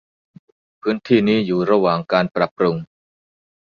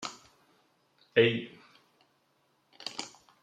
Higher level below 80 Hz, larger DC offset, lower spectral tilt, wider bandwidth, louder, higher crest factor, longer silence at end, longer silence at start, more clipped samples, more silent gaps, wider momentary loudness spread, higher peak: first, -58 dBFS vs -76 dBFS; neither; first, -8 dB/octave vs -4.5 dB/octave; second, 6.8 kHz vs 10 kHz; first, -19 LUFS vs -30 LUFS; second, 18 dB vs 26 dB; first, 0.8 s vs 0.35 s; first, 0.85 s vs 0 s; neither; first, 2.51-2.56 s vs none; second, 8 LU vs 20 LU; first, -2 dBFS vs -10 dBFS